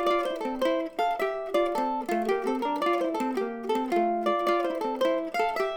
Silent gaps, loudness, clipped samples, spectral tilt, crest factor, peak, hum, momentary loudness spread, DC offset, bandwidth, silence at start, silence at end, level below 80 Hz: none; -28 LUFS; under 0.1%; -4.5 dB/octave; 14 dB; -12 dBFS; none; 4 LU; under 0.1%; 19.5 kHz; 0 s; 0 s; -60 dBFS